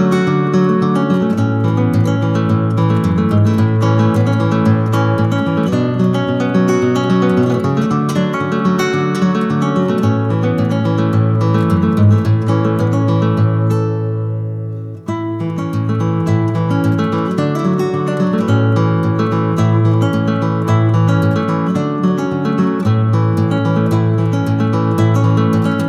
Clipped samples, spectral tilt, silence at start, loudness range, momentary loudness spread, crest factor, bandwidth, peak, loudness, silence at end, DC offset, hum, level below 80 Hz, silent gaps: under 0.1%; -8 dB/octave; 0 s; 3 LU; 4 LU; 12 dB; 9.6 kHz; -2 dBFS; -15 LUFS; 0 s; under 0.1%; none; -50 dBFS; none